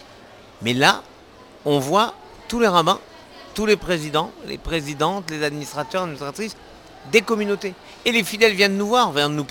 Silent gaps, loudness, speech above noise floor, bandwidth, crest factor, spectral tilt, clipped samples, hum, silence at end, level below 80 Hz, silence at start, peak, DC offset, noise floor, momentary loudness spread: none; -20 LUFS; 25 dB; 19 kHz; 22 dB; -4 dB/octave; under 0.1%; none; 0 s; -48 dBFS; 0.35 s; 0 dBFS; under 0.1%; -46 dBFS; 13 LU